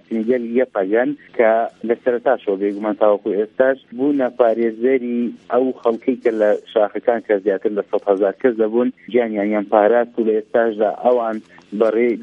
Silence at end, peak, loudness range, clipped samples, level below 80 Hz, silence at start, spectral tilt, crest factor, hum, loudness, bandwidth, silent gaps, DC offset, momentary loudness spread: 0 s; 0 dBFS; 1 LU; under 0.1%; -70 dBFS; 0.1 s; -8 dB/octave; 18 dB; none; -18 LUFS; 5.2 kHz; none; under 0.1%; 5 LU